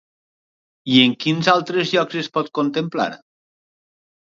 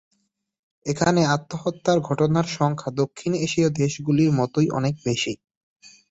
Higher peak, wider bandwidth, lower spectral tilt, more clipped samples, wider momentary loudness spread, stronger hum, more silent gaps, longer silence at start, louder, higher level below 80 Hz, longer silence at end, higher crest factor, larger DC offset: first, 0 dBFS vs -6 dBFS; about the same, 7.4 kHz vs 8 kHz; about the same, -5.5 dB/octave vs -6 dB/octave; neither; about the same, 9 LU vs 7 LU; neither; second, none vs 5.57-5.76 s; about the same, 0.85 s vs 0.85 s; first, -19 LUFS vs -23 LUFS; second, -68 dBFS vs -56 dBFS; first, 1.2 s vs 0.25 s; about the same, 22 dB vs 18 dB; neither